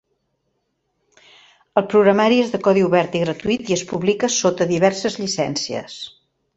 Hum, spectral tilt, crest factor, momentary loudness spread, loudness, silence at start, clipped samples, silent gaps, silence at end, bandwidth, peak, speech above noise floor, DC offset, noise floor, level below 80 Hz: none; -4.5 dB/octave; 18 dB; 10 LU; -18 LUFS; 1.75 s; under 0.1%; none; 0.5 s; 8.2 kHz; -2 dBFS; 53 dB; under 0.1%; -71 dBFS; -58 dBFS